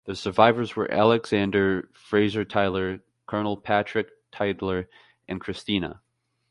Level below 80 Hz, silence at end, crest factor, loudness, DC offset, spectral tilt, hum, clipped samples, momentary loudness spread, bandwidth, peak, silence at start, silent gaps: -52 dBFS; 0.6 s; 24 dB; -25 LUFS; under 0.1%; -6.5 dB/octave; none; under 0.1%; 14 LU; 11.5 kHz; -2 dBFS; 0.05 s; none